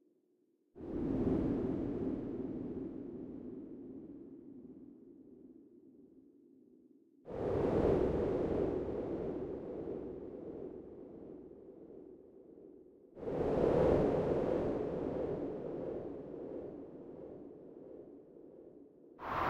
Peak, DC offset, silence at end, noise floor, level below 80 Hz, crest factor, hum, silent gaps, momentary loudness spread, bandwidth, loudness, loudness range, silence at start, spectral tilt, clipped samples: -18 dBFS; under 0.1%; 0 s; -75 dBFS; -56 dBFS; 20 dB; none; none; 24 LU; 8.4 kHz; -37 LUFS; 16 LU; 0.75 s; -9.5 dB/octave; under 0.1%